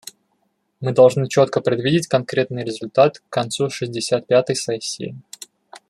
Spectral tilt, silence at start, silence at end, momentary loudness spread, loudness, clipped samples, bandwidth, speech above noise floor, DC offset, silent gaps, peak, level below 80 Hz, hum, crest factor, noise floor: -5 dB/octave; 0.8 s; 0.15 s; 18 LU; -19 LUFS; under 0.1%; 13 kHz; 50 dB; under 0.1%; none; -2 dBFS; -62 dBFS; none; 18 dB; -68 dBFS